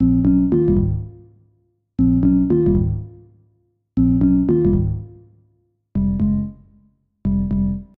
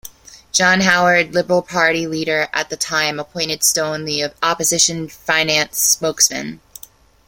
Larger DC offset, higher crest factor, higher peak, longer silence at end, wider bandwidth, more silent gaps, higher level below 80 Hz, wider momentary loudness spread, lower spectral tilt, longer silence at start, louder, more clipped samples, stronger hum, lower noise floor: neither; about the same, 14 dB vs 18 dB; second, -6 dBFS vs 0 dBFS; second, 0.15 s vs 0.7 s; second, 2.3 kHz vs 17 kHz; neither; first, -30 dBFS vs -54 dBFS; first, 14 LU vs 8 LU; first, -14 dB/octave vs -2 dB/octave; about the same, 0 s vs 0.05 s; about the same, -18 LUFS vs -16 LUFS; neither; neither; first, -63 dBFS vs -44 dBFS